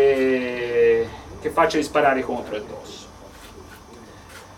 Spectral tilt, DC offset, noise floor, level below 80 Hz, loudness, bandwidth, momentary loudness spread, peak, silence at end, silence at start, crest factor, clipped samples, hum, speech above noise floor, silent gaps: -5 dB/octave; under 0.1%; -43 dBFS; -50 dBFS; -21 LUFS; 15.5 kHz; 24 LU; -4 dBFS; 0 s; 0 s; 18 dB; under 0.1%; none; 21 dB; none